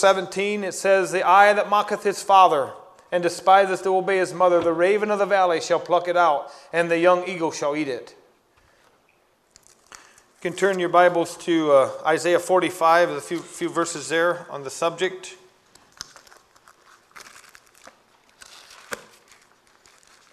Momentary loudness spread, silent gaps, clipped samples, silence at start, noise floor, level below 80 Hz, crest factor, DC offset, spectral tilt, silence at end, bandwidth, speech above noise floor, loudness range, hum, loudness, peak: 15 LU; none; under 0.1%; 0 s; -62 dBFS; -70 dBFS; 20 dB; under 0.1%; -4 dB/octave; 1.3 s; 13.5 kHz; 42 dB; 12 LU; none; -20 LUFS; -2 dBFS